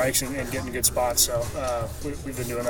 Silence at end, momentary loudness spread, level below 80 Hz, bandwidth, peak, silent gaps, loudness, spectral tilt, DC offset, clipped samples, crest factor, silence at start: 0 s; 11 LU; -40 dBFS; 19 kHz; -4 dBFS; none; -25 LUFS; -3 dB/octave; under 0.1%; under 0.1%; 22 dB; 0 s